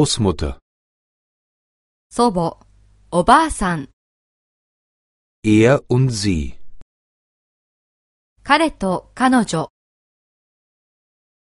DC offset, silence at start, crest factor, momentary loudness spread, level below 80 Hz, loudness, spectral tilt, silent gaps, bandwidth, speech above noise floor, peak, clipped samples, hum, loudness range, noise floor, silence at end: under 0.1%; 0 s; 20 dB; 14 LU; -38 dBFS; -17 LUFS; -5.5 dB/octave; 0.62-2.10 s, 3.93-5.43 s, 6.82-8.36 s; 11.5 kHz; 32 dB; 0 dBFS; under 0.1%; none; 3 LU; -49 dBFS; 1.9 s